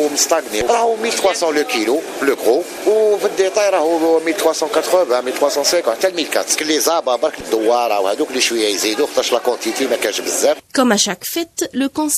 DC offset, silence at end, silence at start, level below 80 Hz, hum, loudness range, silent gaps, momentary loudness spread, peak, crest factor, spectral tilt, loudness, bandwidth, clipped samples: under 0.1%; 0 s; 0 s; -56 dBFS; none; 1 LU; none; 4 LU; -2 dBFS; 16 dB; -1.5 dB/octave; -16 LUFS; 15 kHz; under 0.1%